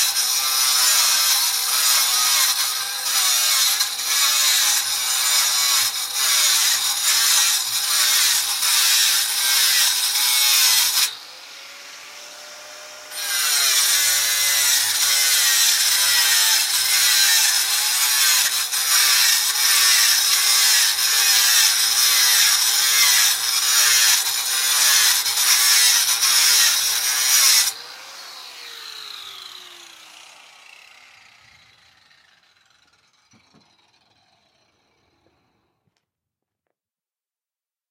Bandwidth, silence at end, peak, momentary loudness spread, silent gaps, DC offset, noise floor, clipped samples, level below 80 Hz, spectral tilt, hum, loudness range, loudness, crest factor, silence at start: 16 kHz; 8.15 s; -2 dBFS; 10 LU; none; under 0.1%; under -90 dBFS; under 0.1%; -82 dBFS; 4.5 dB/octave; none; 5 LU; -15 LUFS; 18 dB; 0 s